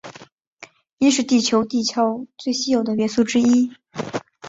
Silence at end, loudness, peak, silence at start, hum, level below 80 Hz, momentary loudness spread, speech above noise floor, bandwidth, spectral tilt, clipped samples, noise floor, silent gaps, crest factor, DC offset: 0 s; -20 LUFS; -6 dBFS; 0.05 s; none; -62 dBFS; 12 LU; 28 dB; 8 kHz; -3.5 dB/octave; under 0.1%; -47 dBFS; 0.32-0.38 s, 0.47-0.57 s, 0.93-0.98 s; 16 dB; under 0.1%